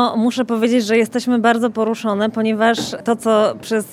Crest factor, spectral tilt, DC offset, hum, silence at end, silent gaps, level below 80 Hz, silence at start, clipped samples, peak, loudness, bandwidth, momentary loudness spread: 14 dB; -4.5 dB/octave; under 0.1%; none; 0 s; none; -66 dBFS; 0 s; under 0.1%; -2 dBFS; -17 LUFS; 15 kHz; 5 LU